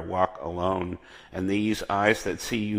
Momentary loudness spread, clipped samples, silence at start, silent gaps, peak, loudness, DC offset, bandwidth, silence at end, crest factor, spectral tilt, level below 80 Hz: 11 LU; under 0.1%; 0 s; none; -6 dBFS; -27 LUFS; under 0.1%; 15.5 kHz; 0 s; 22 dB; -5 dB/octave; -52 dBFS